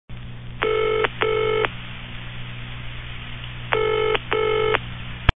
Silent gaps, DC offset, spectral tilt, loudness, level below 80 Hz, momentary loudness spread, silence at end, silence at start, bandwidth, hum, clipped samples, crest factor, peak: none; 0.4%; -7.5 dB/octave; -23 LUFS; -34 dBFS; 14 LU; 0.1 s; 0.1 s; 4 kHz; 60 Hz at -35 dBFS; under 0.1%; 24 dB; 0 dBFS